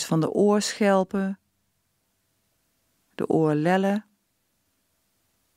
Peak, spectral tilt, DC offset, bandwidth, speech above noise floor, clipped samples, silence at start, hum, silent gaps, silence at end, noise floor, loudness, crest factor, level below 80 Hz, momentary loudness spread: -8 dBFS; -5.5 dB/octave; under 0.1%; 15.5 kHz; 51 dB; under 0.1%; 0 s; none; none; 1.55 s; -73 dBFS; -23 LUFS; 18 dB; -70 dBFS; 10 LU